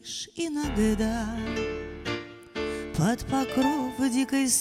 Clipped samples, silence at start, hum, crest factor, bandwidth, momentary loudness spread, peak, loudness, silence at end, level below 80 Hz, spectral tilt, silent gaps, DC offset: under 0.1%; 0.05 s; none; 16 dB; 16 kHz; 9 LU; -12 dBFS; -28 LUFS; 0 s; -42 dBFS; -4 dB/octave; none; under 0.1%